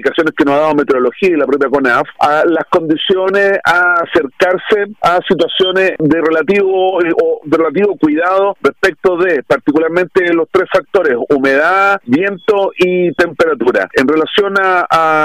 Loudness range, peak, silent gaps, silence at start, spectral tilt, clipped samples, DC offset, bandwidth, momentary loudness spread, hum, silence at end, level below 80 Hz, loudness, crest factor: 1 LU; -2 dBFS; none; 0 s; -5.5 dB/octave; under 0.1%; 0.3%; 14 kHz; 3 LU; none; 0 s; -48 dBFS; -12 LUFS; 10 dB